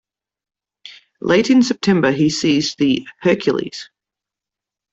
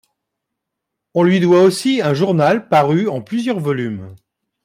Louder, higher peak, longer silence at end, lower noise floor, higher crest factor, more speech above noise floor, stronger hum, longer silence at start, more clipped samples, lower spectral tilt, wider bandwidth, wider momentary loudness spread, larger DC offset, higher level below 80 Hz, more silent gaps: about the same, -16 LUFS vs -15 LUFS; about the same, -2 dBFS vs -2 dBFS; first, 1.1 s vs 0.5 s; first, -86 dBFS vs -79 dBFS; about the same, 16 dB vs 14 dB; first, 70 dB vs 64 dB; neither; second, 0.85 s vs 1.15 s; neither; second, -5 dB/octave vs -6.5 dB/octave; second, 8 kHz vs 15.5 kHz; about the same, 10 LU vs 10 LU; neither; first, -56 dBFS vs -62 dBFS; neither